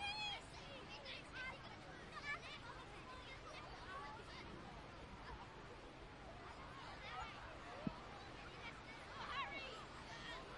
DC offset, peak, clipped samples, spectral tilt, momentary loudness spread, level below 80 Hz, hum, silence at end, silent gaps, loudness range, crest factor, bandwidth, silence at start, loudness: under 0.1%; -30 dBFS; under 0.1%; -4 dB/octave; 9 LU; -64 dBFS; none; 0 s; none; 4 LU; 22 dB; 11 kHz; 0 s; -52 LUFS